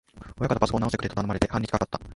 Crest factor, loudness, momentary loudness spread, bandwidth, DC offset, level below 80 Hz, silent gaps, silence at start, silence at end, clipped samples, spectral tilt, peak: 24 dB; -27 LUFS; 6 LU; 11.5 kHz; under 0.1%; -42 dBFS; none; 0.15 s; 0 s; under 0.1%; -6.5 dB/octave; -2 dBFS